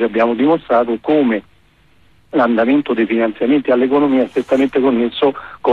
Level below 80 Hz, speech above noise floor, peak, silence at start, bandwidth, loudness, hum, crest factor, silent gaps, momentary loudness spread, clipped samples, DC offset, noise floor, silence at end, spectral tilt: -54 dBFS; 39 dB; -4 dBFS; 0 s; 7.2 kHz; -15 LUFS; none; 12 dB; none; 4 LU; under 0.1%; under 0.1%; -53 dBFS; 0 s; -7 dB/octave